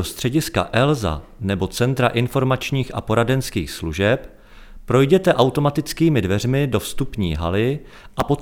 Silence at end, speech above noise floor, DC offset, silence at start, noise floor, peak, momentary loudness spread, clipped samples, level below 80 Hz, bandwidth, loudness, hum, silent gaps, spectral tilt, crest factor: 0 s; 21 dB; under 0.1%; 0 s; -40 dBFS; 0 dBFS; 9 LU; under 0.1%; -38 dBFS; 18.5 kHz; -20 LUFS; none; none; -6 dB/octave; 20 dB